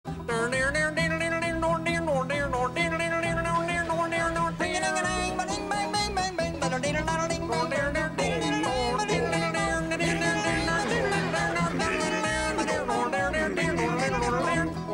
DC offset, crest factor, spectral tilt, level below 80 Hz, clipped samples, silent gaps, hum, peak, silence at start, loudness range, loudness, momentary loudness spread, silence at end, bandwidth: under 0.1%; 14 dB; -4.5 dB/octave; -44 dBFS; under 0.1%; none; none; -14 dBFS; 0.05 s; 1 LU; -27 LUFS; 3 LU; 0 s; 16 kHz